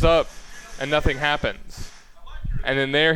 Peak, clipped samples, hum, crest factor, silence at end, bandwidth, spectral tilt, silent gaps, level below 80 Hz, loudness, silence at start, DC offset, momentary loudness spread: -4 dBFS; under 0.1%; none; 18 dB; 0 s; 13.5 kHz; -5 dB/octave; none; -32 dBFS; -23 LUFS; 0 s; under 0.1%; 21 LU